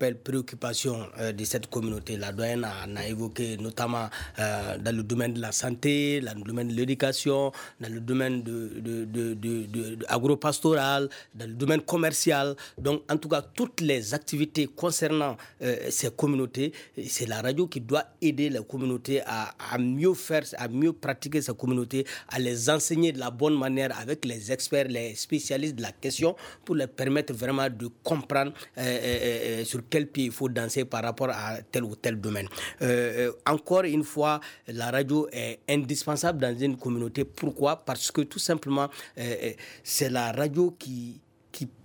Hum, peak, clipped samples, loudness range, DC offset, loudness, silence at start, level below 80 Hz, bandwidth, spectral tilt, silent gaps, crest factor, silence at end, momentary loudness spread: none; -10 dBFS; under 0.1%; 3 LU; under 0.1%; -28 LUFS; 0 s; -60 dBFS; over 20 kHz; -4.5 dB/octave; none; 18 dB; 0.15 s; 8 LU